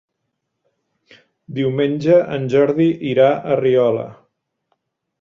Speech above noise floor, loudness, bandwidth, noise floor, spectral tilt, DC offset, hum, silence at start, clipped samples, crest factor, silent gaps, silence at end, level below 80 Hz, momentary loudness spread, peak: 59 dB; -16 LUFS; 7.2 kHz; -75 dBFS; -8 dB/octave; under 0.1%; none; 1.5 s; under 0.1%; 16 dB; none; 1.1 s; -60 dBFS; 8 LU; -2 dBFS